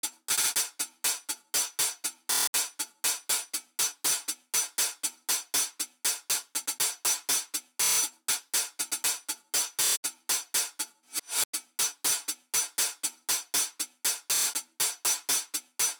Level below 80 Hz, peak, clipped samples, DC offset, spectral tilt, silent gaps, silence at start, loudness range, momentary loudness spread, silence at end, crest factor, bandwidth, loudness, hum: -82 dBFS; -18 dBFS; under 0.1%; under 0.1%; 2.5 dB/octave; 2.47-2.53 s, 9.97-10.03 s, 11.45-11.53 s; 0.05 s; 1 LU; 6 LU; 0.05 s; 14 dB; over 20 kHz; -28 LUFS; none